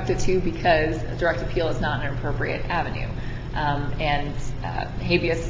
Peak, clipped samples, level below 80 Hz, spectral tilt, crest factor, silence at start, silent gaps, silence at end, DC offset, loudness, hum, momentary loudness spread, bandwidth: -6 dBFS; under 0.1%; -32 dBFS; -6 dB/octave; 18 dB; 0 s; none; 0 s; under 0.1%; -25 LUFS; none; 9 LU; 7.6 kHz